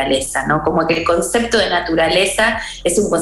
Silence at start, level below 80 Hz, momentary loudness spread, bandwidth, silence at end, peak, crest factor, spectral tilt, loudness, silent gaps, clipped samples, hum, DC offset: 0 s; -38 dBFS; 4 LU; 13.5 kHz; 0 s; -2 dBFS; 12 dB; -3 dB/octave; -16 LUFS; none; under 0.1%; none; under 0.1%